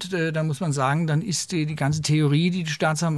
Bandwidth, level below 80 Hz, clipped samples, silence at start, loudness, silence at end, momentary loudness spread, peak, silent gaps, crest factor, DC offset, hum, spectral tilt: 12 kHz; -60 dBFS; under 0.1%; 0 s; -23 LUFS; 0 s; 5 LU; -8 dBFS; none; 14 dB; under 0.1%; none; -5.5 dB/octave